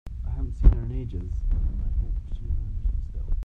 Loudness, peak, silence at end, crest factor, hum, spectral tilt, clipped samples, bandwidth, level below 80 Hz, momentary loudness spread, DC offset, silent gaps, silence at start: -29 LUFS; -4 dBFS; 0 s; 20 dB; none; -10 dB/octave; under 0.1%; 2.3 kHz; -24 dBFS; 11 LU; under 0.1%; none; 0.05 s